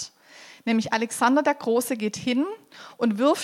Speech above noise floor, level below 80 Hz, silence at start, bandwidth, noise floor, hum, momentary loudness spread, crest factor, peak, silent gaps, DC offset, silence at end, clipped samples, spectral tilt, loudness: 25 dB; -72 dBFS; 0 s; 16 kHz; -49 dBFS; none; 13 LU; 18 dB; -8 dBFS; none; under 0.1%; 0 s; under 0.1%; -4 dB/octave; -24 LUFS